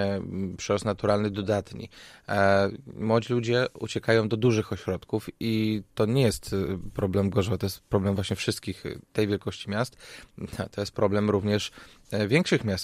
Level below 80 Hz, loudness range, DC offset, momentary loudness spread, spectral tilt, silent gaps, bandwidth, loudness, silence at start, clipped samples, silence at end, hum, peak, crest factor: -52 dBFS; 4 LU; under 0.1%; 11 LU; -6 dB/octave; none; 15 kHz; -27 LUFS; 0 s; under 0.1%; 0 s; none; -8 dBFS; 20 dB